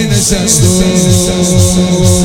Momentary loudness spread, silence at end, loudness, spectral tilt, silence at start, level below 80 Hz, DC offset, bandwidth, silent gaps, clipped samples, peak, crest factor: 2 LU; 0 s; -8 LUFS; -4.5 dB/octave; 0 s; -22 dBFS; under 0.1%; 17 kHz; none; 0.4%; 0 dBFS; 8 dB